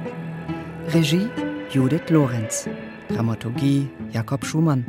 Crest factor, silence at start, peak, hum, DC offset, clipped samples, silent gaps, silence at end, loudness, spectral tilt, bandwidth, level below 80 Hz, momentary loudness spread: 16 dB; 0 s; -6 dBFS; none; under 0.1%; under 0.1%; none; 0 s; -23 LUFS; -6 dB/octave; 16.5 kHz; -56 dBFS; 12 LU